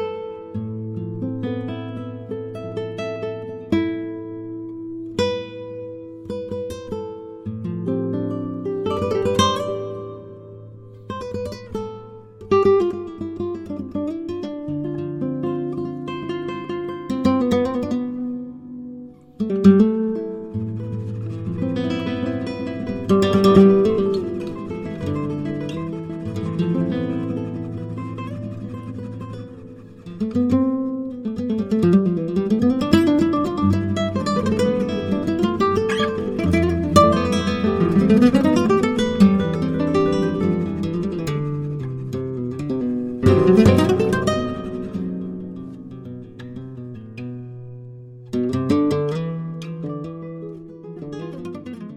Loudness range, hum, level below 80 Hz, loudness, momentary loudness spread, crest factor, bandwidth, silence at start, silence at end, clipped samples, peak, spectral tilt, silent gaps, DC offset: 10 LU; none; -48 dBFS; -21 LUFS; 18 LU; 20 dB; 13 kHz; 0 s; 0 s; under 0.1%; 0 dBFS; -7 dB/octave; none; under 0.1%